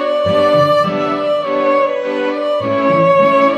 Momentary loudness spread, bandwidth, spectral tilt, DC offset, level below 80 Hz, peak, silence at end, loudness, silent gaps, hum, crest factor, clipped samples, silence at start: 7 LU; 8.8 kHz; -6.5 dB/octave; under 0.1%; -56 dBFS; -2 dBFS; 0 s; -14 LUFS; none; none; 12 dB; under 0.1%; 0 s